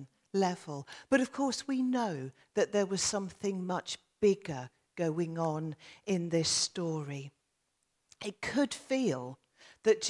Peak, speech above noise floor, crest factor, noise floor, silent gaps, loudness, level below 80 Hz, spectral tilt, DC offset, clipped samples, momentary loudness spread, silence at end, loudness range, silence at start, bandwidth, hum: -14 dBFS; 47 dB; 20 dB; -80 dBFS; none; -33 LUFS; -72 dBFS; -4 dB/octave; under 0.1%; under 0.1%; 13 LU; 0 s; 2 LU; 0 s; 12 kHz; none